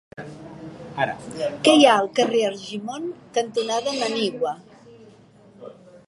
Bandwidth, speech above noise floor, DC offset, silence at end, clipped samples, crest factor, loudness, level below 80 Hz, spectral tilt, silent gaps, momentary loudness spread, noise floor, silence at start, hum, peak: 11.5 kHz; 29 dB; under 0.1%; 0.1 s; under 0.1%; 22 dB; -21 LUFS; -64 dBFS; -3.5 dB/octave; none; 24 LU; -50 dBFS; 0.2 s; none; -2 dBFS